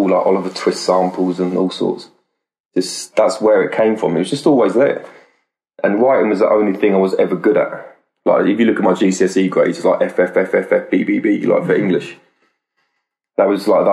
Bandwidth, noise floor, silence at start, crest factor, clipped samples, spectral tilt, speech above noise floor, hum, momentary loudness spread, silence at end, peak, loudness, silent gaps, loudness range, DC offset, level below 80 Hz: 13 kHz; -73 dBFS; 0 s; 14 dB; under 0.1%; -6 dB/octave; 58 dB; none; 7 LU; 0 s; -2 dBFS; -15 LUFS; 2.60-2.64 s; 3 LU; under 0.1%; -64 dBFS